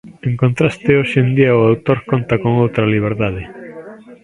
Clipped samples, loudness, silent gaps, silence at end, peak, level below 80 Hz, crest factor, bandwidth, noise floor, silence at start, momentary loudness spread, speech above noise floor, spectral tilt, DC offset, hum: under 0.1%; -15 LUFS; none; 0.1 s; 0 dBFS; -42 dBFS; 16 dB; 10.5 kHz; -35 dBFS; 0.05 s; 17 LU; 21 dB; -8.5 dB/octave; under 0.1%; none